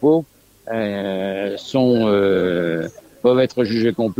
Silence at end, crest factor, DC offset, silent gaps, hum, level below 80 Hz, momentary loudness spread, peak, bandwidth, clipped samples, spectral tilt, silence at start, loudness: 0.05 s; 16 dB; under 0.1%; none; none; -56 dBFS; 9 LU; -4 dBFS; 15.5 kHz; under 0.1%; -7 dB/octave; 0 s; -19 LUFS